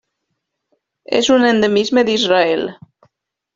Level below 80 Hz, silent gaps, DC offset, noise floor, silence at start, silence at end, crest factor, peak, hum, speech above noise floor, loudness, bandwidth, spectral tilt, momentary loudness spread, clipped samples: -58 dBFS; none; under 0.1%; -74 dBFS; 1.1 s; 0.8 s; 16 dB; 0 dBFS; none; 60 dB; -14 LUFS; 7.8 kHz; -4 dB/octave; 8 LU; under 0.1%